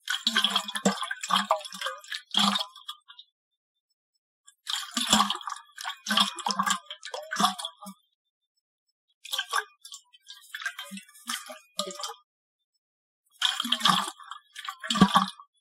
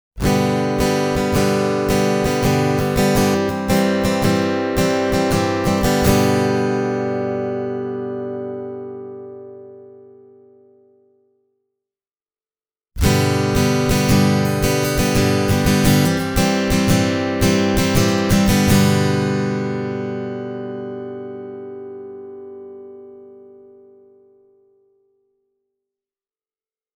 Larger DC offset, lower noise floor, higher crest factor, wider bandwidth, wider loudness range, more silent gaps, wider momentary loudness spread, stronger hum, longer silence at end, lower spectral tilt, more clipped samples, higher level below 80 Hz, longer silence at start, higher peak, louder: neither; second, -52 dBFS vs under -90 dBFS; first, 26 dB vs 18 dB; second, 16 kHz vs over 20 kHz; second, 10 LU vs 17 LU; first, 3.32-3.51 s, 3.57-4.44 s, 8.15-8.41 s, 8.47-8.55 s, 8.61-8.86 s, 8.92-9.08 s, 9.14-9.21 s, 12.24-13.24 s vs none; first, 20 LU vs 17 LU; neither; second, 0.15 s vs 3.55 s; second, -2.5 dB/octave vs -5.5 dB/octave; neither; second, -64 dBFS vs -34 dBFS; about the same, 0.05 s vs 0.15 s; second, -4 dBFS vs 0 dBFS; second, -27 LUFS vs -18 LUFS